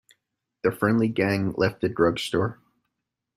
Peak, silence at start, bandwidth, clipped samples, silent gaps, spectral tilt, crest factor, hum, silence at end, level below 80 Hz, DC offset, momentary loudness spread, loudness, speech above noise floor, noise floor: -8 dBFS; 0.65 s; 15 kHz; under 0.1%; none; -6.5 dB/octave; 18 dB; none; 0.85 s; -58 dBFS; under 0.1%; 5 LU; -24 LUFS; 59 dB; -82 dBFS